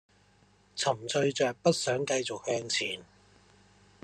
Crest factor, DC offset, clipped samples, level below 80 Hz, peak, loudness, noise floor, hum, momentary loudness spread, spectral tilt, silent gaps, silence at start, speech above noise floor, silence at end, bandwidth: 20 dB; under 0.1%; under 0.1%; -72 dBFS; -12 dBFS; -30 LUFS; -64 dBFS; none; 7 LU; -3.5 dB/octave; none; 0.75 s; 34 dB; 1 s; 13.5 kHz